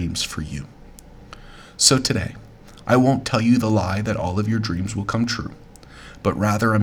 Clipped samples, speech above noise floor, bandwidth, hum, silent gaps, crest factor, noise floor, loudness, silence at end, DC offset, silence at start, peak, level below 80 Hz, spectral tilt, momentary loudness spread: under 0.1%; 23 dB; 18 kHz; none; none; 22 dB; -43 dBFS; -20 LUFS; 0 s; under 0.1%; 0 s; 0 dBFS; -44 dBFS; -4.5 dB/octave; 18 LU